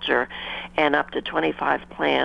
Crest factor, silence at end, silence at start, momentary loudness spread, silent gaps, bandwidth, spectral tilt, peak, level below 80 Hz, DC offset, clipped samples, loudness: 20 dB; 0 s; 0 s; 7 LU; none; 9.6 kHz; -5.5 dB/octave; -4 dBFS; -52 dBFS; under 0.1%; under 0.1%; -24 LUFS